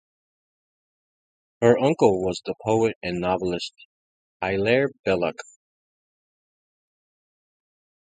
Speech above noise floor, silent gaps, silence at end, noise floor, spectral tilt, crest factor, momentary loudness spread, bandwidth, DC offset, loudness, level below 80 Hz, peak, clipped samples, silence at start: over 68 dB; 2.95-3.01 s, 3.85-4.40 s, 4.99-5.04 s; 2.7 s; under -90 dBFS; -6 dB/octave; 24 dB; 11 LU; 9.4 kHz; under 0.1%; -23 LUFS; -56 dBFS; -4 dBFS; under 0.1%; 1.6 s